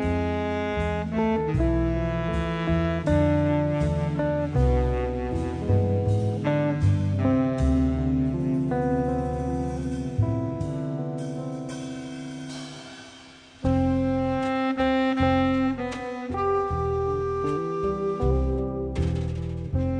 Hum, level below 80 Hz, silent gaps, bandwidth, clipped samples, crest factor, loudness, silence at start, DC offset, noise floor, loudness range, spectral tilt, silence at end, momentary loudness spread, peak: none; -34 dBFS; none; 10 kHz; under 0.1%; 14 dB; -26 LUFS; 0 s; under 0.1%; -48 dBFS; 6 LU; -8 dB/octave; 0 s; 9 LU; -10 dBFS